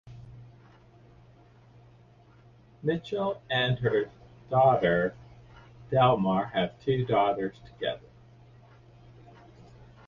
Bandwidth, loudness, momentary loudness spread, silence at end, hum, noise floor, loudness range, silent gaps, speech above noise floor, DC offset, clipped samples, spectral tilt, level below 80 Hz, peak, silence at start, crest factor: 7 kHz; -27 LUFS; 14 LU; 0.25 s; none; -56 dBFS; 8 LU; none; 30 dB; under 0.1%; under 0.1%; -8 dB/octave; -58 dBFS; -10 dBFS; 0.05 s; 20 dB